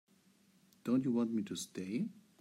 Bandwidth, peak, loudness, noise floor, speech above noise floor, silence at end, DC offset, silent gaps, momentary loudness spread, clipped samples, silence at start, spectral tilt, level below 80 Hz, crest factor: 15.5 kHz; -22 dBFS; -37 LUFS; -69 dBFS; 33 dB; 0.2 s; under 0.1%; none; 10 LU; under 0.1%; 0.85 s; -6 dB/octave; -86 dBFS; 16 dB